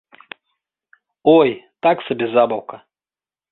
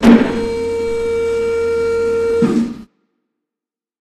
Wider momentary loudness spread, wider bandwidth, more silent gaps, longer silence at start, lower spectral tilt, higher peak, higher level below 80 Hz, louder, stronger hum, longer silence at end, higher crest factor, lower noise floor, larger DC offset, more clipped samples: about the same, 9 LU vs 7 LU; second, 4.2 kHz vs 12 kHz; neither; first, 1.25 s vs 0 s; first, -10 dB/octave vs -6.5 dB/octave; about the same, -2 dBFS vs 0 dBFS; second, -64 dBFS vs -40 dBFS; about the same, -17 LUFS vs -16 LUFS; neither; second, 0.75 s vs 1.15 s; about the same, 18 dB vs 16 dB; about the same, under -90 dBFS vs -88 dBFS; neither; second, under 0.1% vs 0.1%